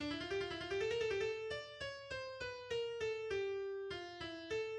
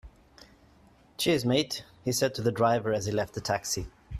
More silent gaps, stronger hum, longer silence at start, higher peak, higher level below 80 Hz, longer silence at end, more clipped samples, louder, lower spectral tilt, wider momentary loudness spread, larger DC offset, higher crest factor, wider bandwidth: neither; neither; about the same, 0 s vs 0.05 s; second, -28 dBFS vs -12 dBFS; second, -66 dBFS vs -52 dBFS; about the same, 0 s vs 0 s; neither; second, -42 LUFS vs -28 LUFS; about the same, -4 dB/octave vs -4.5 dB/octave; about the same, 8 LU vs 8 LU; neither; about the same, 14 dB vs 18 dB; second, 10.5 kHz vs 14.5 kHz